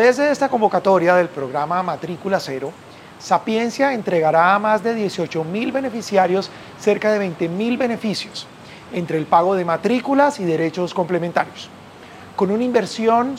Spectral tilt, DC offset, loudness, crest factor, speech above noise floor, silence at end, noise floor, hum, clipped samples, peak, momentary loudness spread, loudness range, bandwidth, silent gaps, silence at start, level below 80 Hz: -5.5 dB/octave; under 0.1%; -19 LUFS; 16 dB; 21 dB; 0 s; -40 dBFS; none; under 0.1%; -2 dBFS; 13 LU; 2 LU; 15.5 kHz; none; 0 s; -64 dBFS